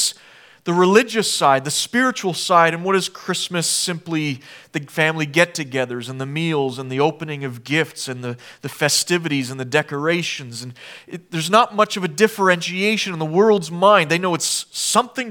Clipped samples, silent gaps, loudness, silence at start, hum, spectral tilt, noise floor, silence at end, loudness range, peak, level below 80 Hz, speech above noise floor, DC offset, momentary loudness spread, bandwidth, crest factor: under 0.1%; none; -19 LUFS; 0 s; none; -3.5 dB/octave; -48 dBFS; 0 s; 5 LU; 0 dBFS; -72 dBFS; 28 dB; under 0.1%; 14 LU; 19.5 kHz; 20 dB